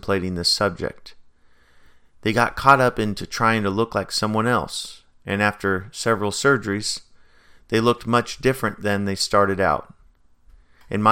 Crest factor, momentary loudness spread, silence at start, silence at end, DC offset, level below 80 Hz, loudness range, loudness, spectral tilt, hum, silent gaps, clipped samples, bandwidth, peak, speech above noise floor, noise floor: 22 dB; 10 LU; 0.05 s; 0 s; under 0.1%; -48 dBFS; 2 LU; -21 LUFS; -4.5 dB/octave; none; none; under 0.1%; 17 kHz; 0 dBFS; 33 dB; -54 dBFS